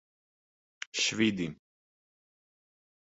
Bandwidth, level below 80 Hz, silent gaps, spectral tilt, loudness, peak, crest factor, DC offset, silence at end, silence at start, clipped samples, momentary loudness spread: 8 kHz; -68 dBFS; none; -3 dB/octave; -30 LUFS; -14 dBFS; 22 dB; under 0.1%; 1.55 s; 0.95 s; under 0.1%; 12 LU